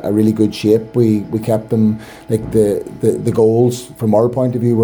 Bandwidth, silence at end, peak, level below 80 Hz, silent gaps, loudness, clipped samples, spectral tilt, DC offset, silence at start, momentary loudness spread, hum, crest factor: over 20 kHz; 0 s; 0 dBFS; -46 dBFS; none; -15 LUFS; under 0.1%; -8 dB/octave; under 0.1%; 0 s; 5 LU; none; 14 dB